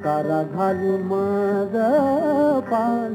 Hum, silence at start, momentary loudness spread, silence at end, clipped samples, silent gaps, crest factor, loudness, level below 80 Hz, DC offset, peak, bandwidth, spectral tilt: none; 0 s; 4 LU; 0 s; under 0.1%; none; 12 dB; -21 LUFS; -64 dBFS; under 0.1%; -8 dBFS; 18.5 kHz; -8.5 dB/octave